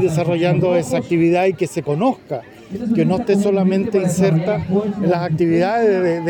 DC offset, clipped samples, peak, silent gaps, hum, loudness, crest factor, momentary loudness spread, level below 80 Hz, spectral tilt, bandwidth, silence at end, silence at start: under 0.1%; under 0.1%; -4 dBFS; none; none; -17 LUFS; 12 dB; 6 LU; -54 dBFS; -7 dB/octave; 17 kHz; 0 s; 0 s